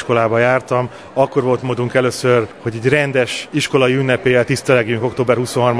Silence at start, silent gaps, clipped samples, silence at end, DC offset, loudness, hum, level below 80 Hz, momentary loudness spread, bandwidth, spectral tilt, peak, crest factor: 0 s; none; under 0.1%; 0 s; 0.2%; -16 LUFS; none; -52 dBFS; 5 LU; 11 kHz; -5.5 dB/octave; 0 dBFS; 16 dB